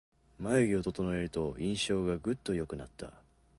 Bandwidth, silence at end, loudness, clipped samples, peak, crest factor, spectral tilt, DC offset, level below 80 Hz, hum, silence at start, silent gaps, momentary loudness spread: 11.5 kHz; 0.45 s; -33 LUFS; under 0.1%; -16 dBFS; 18 dB; -5.5 dB/octave; under 0.1%; -54 dBFS; none; 0.4 s; none; 15 LU